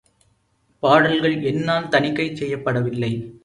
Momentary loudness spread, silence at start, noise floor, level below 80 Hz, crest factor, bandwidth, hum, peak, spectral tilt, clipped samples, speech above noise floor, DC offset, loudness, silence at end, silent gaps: 9 LU; 0.85 s; -64 dBFS; -56 dBFS; 20 dB; 11 kHz; none; 0 dBFS; -6.5 dB/octave; under 0.1%; 45 dB; under 0.1%; -20 LUFS; 0.05 s; none